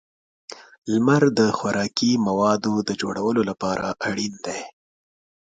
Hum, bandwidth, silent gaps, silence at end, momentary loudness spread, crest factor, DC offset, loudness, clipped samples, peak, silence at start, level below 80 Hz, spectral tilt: none; 9.4 kHz; 0.78-0.82 s; 0.8 s; 18 LU; 18 dB; under 0.1%; -22 LUFS; under 0.1%; -4 dBFS; 0.5 s; -60 dBFS; -5 dB/octave